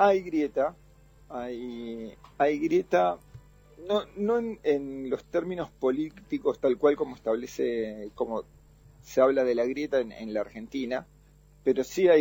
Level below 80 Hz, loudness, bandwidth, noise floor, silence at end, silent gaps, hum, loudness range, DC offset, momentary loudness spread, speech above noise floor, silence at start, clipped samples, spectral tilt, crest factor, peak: -58 dBFS; -29 LUFS; 17 kHz; -57 dBFS; 0 s; none; none; 2 LU; under 0.1%; 13 LU; 29 dB; 0 s; under 0.1%; -6 dB/octave; 18 dB; -10 dBFS